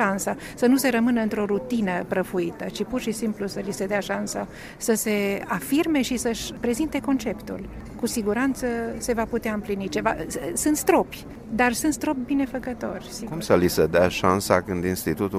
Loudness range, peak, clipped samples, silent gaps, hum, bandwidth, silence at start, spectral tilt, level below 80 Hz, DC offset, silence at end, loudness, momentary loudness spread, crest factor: 4 LU; -2 dBFS; under 0.1%; none; none; 16 kHz; 0 s; -4.5 dB/octave; -46 dBFS; under 0.1%; 0 s; -24 LUFS; 11 LU; 22 dB